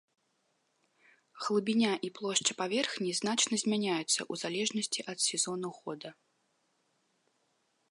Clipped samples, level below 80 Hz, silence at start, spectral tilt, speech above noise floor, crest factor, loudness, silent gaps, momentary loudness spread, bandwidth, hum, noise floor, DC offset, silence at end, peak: under 0.1%; -84 dBFS; 1.35 s; -2.5 dB/octave; 44 dB; 22 dB; -31 LUFS; none; 11 LU; 11.5 kHz; none; -77 dBFS; under 0.1%; 1.8 s; -12 dBFS